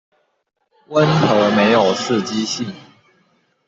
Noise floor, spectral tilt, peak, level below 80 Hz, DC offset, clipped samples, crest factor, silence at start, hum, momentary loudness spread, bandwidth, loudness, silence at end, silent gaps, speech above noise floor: -61 dBFS; -5 dB/octave; -2 dBFS; -58 dBFS; under 0.1%; under 0.1%; 16 dB; 0.9 s; none; 9 LU; 8 kHz; -16 LUFS; 0.9 s; none; 44 dB